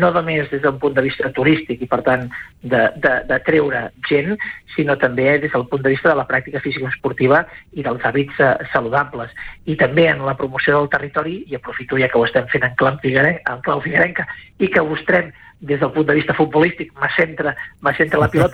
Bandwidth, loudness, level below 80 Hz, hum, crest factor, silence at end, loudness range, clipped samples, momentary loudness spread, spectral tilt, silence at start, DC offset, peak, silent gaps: 10.5 kHz; -17 LUFS; -46 dBFS; none; 16 dB; 0 s; 1 LU; under 0.1%; 9 LU; -8 dB/octave; 0 s; under 0.1%; -2 dBFS; none